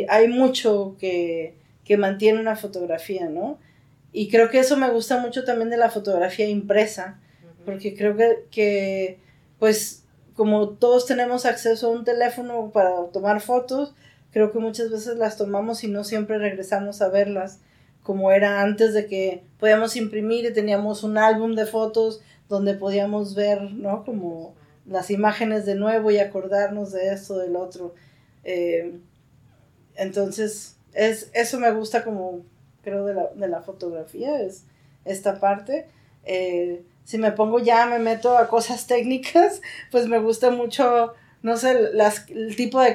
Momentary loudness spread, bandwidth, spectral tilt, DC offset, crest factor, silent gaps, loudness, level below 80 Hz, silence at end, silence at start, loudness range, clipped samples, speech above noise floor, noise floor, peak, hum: 13 LU; 16 kHz; -4.5 dB/octave; under 0.1%; 18 dB; none; -22 LUFS; -68 dBFS; 0 s; 0 s; 7 LU; under 0.1%; 35 dB; -56 dBFS; -4 dBFS; none